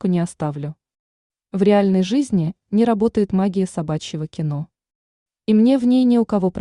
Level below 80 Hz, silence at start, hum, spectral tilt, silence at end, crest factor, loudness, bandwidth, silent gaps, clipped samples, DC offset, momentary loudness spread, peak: -54 dBFS; 0.05 s; none; -7.5 dB/octave; 0 s; 16 dB; -19 LUFS; 11 kHz; 0.99-1.30 s, 4.95-5.26 s; under 0.1%; under 0.1%; 14 LU; -4 dBFS